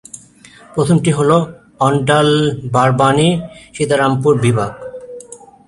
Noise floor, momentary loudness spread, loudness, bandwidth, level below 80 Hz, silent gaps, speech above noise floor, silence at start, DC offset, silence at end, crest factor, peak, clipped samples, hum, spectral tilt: -43 dBFS; 19 LU; -14 LUFS; 11.5 kHz; -48 dBFS; none; 29 dB; 0.15 s; under 0.1%; 0.3 s; 14 dB; 0 dBFS; under 0.1%; none; -6 dB/octave